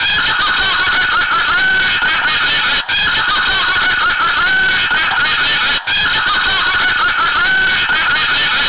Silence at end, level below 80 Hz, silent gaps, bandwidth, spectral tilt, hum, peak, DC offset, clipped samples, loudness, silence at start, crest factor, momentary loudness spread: 0 s; -38 dBFS; none; 4 kHz; -5 dB/octave; none; -8 dBFS; 2%; under 0.1%; -12 LUFS; 0 s; 6 dB; 1 LU